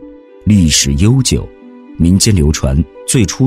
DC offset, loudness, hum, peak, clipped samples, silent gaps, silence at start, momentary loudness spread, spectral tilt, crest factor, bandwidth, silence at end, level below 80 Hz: under 0.1%; -12 LUFS; none; 0 dBFS; under 0.1%; none; 0 s; 8 LU; -4.5 dB/octave; 12 dB; 16 kHz; 0 s; -22 dBFS